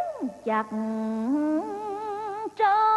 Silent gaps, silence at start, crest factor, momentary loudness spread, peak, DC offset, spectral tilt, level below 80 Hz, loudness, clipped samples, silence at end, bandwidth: none; 0 s; 14 dB; 9 LU; -12 dBFS; under 0.1%; -6.5 dB/octave; -70 dBFS; -28 LUFS; under 0.1%; 0 s; 12 kHz